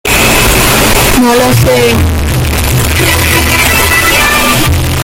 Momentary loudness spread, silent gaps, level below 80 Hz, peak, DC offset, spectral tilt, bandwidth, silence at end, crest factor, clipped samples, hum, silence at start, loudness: 4 LU; none; -18 dBFS; 0 dBFS; under 0.1%; -3.5 dB/octave; 17.5 kHz; 0 s; 8 dB; 0.2%; none; 0.05 s; -7 LUFS